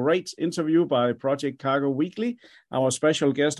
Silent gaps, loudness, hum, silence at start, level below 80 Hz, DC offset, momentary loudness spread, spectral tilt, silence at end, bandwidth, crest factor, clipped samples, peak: none; -25 LUFS; none; 0 s; -68 dBFS; under 0.1%; 8 LU; -5 dB/octave; 0 s; 12 kHz; 14 dB; under 0.1%; -10 dBFS